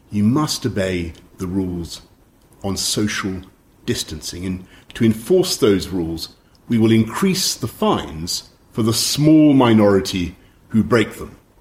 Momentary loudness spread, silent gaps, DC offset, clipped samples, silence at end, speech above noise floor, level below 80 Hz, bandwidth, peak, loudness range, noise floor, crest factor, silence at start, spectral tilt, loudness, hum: 17 LU; none; under 0.1%; under 0.1%; 0.25 s; 34 dB; -44 dBFS; 16.5 kHz; -2 dBFS; 8 LU; -51 dBFS; 18 dB; 0.1 s; -5 dB/octave; -18 LUFS; none